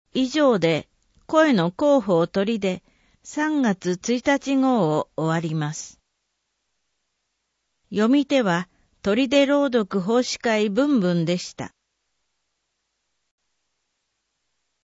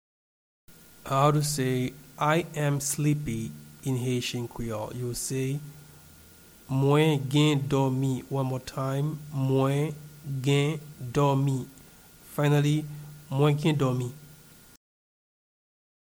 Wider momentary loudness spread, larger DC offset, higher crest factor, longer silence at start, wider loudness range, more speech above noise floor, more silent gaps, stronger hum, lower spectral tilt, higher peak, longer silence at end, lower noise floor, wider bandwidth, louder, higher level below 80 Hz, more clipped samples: about the same, 11 LU vs 13 LU; neither; about the same, 20 dB vs 18 dB; second, 0.15 s vs 0.7 s; about the same, 6 LU vs 4 LU; first, 55 dB vs 27 dB; neither; neither; about the same, -5.5 dB/octave vs -6 dB/octave; first, -4 dBFS vs -10 dBFS; first, 3.2 s vs 1.7 s; first, -76 dBFS vs -53 dBFS; second, 8 kHz vs over 20 kHz; first, -21 LUFS vs -27 LUFS; second, -62 dBFS vs -56 dBFS; neither